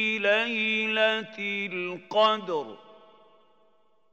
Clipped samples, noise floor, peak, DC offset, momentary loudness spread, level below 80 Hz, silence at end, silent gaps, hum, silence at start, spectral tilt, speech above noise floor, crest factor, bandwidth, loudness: under 0.1%; -67 dBFS; -10 dBFS; under 0.1%; 10 LU; under -90 dBFS; 1.2 s; none; none; 0 s; -4 dB/octave; 41 dB; 18 dB; 8 kHz; -26 LUFS